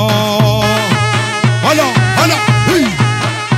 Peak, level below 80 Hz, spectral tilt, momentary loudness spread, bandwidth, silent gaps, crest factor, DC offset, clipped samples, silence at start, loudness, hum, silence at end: 0 dBFS; -38 dBFS; -5 dB/octave; 3 LU; 15.5 kHz; none; 12 dB; under 0.1%; under 0.1%; 0 s; -12 LUFS; none; 0 s